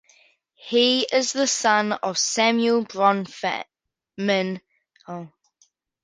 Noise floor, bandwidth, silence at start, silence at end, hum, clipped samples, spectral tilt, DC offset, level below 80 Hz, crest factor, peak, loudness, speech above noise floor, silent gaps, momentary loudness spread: -65 dBFS; 10 kHz; 0.65 s; 0.75 s; none; under 0.1%; -2.5 dB/octave; under 0.1%; -74 dBFS; 20 dB; -4 dBFS; -21 LUFS; 43 dB; none; 18 LU